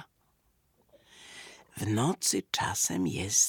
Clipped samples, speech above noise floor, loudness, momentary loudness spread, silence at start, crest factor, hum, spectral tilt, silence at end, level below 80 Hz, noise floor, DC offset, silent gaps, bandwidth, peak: under 0.1%; 42 dB; -29 LUFS; 20 LU; 0 s; 20 dB; none; -3 dB/octave; 0 s; -66 dBFS; -71 dBFS; under 0.1%; none; 19 kHz; -12 dBFS